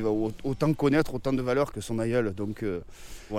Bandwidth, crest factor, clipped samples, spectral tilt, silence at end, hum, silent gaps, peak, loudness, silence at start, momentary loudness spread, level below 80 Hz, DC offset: 16.5 kHz; 16 dB; under 0.1%; -7 dB/octave; 0 s; none; none; -12 dBFS; -28 LUFS; 0 s; 9 LU; -46 dBFS; under 0.1%